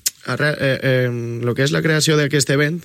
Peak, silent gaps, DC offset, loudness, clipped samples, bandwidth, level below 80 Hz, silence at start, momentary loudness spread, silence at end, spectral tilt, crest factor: -2 dBFS; none; under 0.1%; -18 LUFS; under 0.1%; 16 kHz; -58 dBFS; 0.05 s; 7 LU; 0 s; -4.5 dB/octave; 16 dB